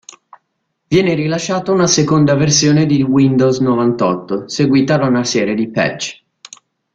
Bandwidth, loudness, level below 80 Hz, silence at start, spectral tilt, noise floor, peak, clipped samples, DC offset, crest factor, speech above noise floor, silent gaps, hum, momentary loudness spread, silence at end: 8.8 kHz; -14 LUFS; -50 dBFS; 0.9 s; -5 dB/octave; -70 dBFS; 0 dBFS; under 0.1%; under 0.1%; 14 dB; 57 dB; none; none; 6 LU; 0.8 s